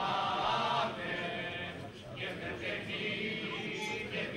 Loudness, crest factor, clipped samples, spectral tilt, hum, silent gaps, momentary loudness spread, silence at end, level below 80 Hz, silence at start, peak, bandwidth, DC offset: -36 LUFS; 16 dB; under 0.1%; -4.5 dB/octave; none; none; 9 LU; 0 s; -64 dBFS; 0 s; -20 dBFS; 16 kHz; under 0.1%